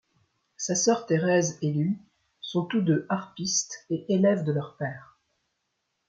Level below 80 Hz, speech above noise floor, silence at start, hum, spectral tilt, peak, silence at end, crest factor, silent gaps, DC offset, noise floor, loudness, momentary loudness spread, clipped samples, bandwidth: -70 dBFS; 53 dB; 0.6 s; none; -4.5 dB/octave; -10 dBFS; 1.05 s; 18 dB; none; under 0.1%; -79 dBFS; -27 LUFS; 12 LU; under 0.1%; 9.2 kHz